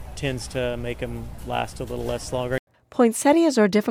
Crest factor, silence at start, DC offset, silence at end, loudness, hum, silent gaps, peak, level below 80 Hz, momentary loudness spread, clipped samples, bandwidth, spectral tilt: 16 dB; 0 s; under 0.1%; 0 s; -24 LUFS; none; 2.59-2.67 s; -6 dBFS; -42 dBFS; 13 LU; under 0.1%; 17.5 kHz; -5 dB/octave